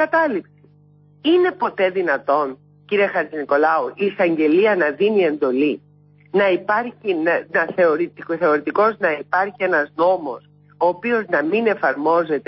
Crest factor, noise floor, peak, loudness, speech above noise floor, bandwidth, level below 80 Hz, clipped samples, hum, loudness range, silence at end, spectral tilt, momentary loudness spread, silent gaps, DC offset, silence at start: 14 dB; -51 dBFS; -6 dBFS; -19 LUFS; 33 dB; 5.8 kHz; -70 dBFS; under 0.1%; 50 Hz at -50 dBFS; 2 LU; 0.05 s; -10 dB/octave; 6 LU; none; under 0.1%; 0 s